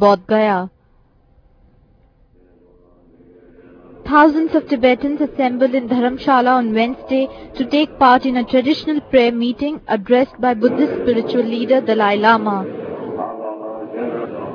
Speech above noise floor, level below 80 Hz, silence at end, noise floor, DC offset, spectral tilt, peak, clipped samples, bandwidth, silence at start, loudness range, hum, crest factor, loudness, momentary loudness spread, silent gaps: 38 dB; -50 dBFS; 0 s; -53 dBFS; under 0.1%; -7 dB/octave; 0 dBFS; under 0.1%; 5.4 kHz; 0 s; 4 LU; none; 16 dB; -16 LUFS; 13 LU; none